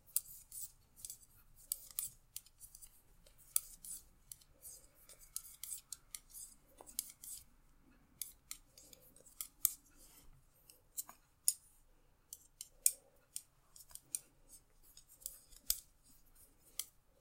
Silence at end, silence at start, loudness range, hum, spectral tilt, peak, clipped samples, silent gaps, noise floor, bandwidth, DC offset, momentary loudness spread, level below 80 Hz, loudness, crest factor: 0.3 s; 0.05 s; 8 LU; none; 1.5 dB/octave; -8 dBFS; under 0.1%; none; -69 dBFS; 16.5 kHz; under 0.1%; 25 LU; -70 dBFS; -43 LUFS; 40 dB